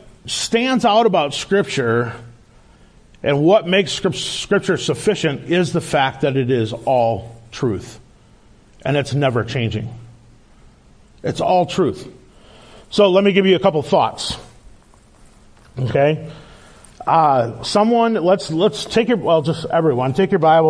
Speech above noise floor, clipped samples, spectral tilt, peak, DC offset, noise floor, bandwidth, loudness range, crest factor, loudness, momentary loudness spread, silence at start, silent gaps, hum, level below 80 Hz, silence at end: 32 dB; under 0.1%; -5.5 dB/octave; -2 dBFS; under 0.1%; -48 dBFS; 11 kHz; 6 LU; 16 dB; -17 LUFS; 12 LU; 0.25 s; none; none; -48 dBFS; 0 s